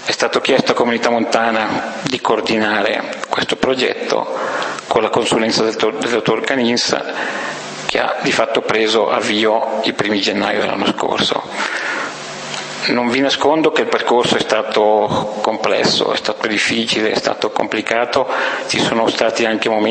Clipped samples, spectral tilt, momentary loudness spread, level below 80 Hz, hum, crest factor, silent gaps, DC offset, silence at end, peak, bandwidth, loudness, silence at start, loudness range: under 0.1%; -3.5 dB/octave; 6 LU; -56 dBFS; none; 16 dB; none; under 0.1%; 0 s; 0 dBFS; 8.8 kHz; -16 LUFS; 0 s; 2 LU